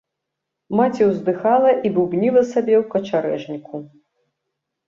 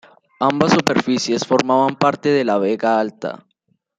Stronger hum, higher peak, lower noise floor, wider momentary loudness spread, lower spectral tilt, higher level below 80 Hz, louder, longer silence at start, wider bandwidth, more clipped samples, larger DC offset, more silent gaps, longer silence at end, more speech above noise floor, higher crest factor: neither; about the same, -4 dBFS vs -2 dBFS; first, -80 dBFS vs -67 dBFS; first, 14 LU vs 9 LU; first, -7.5 dB/octave vs -5 dB/octave; second, -64 dBFS vs -58 dBFS; about the same, -18 LUFS vs -17 LUFS; first, 0.7 s vs 0.4 s; second, 7.4 kHz vs 14 kHz; neither; neither; neither; first, 1 s vs 0.6 s; first, 62 dB vs 50 dB; about the same, 16 dB vs 16 dB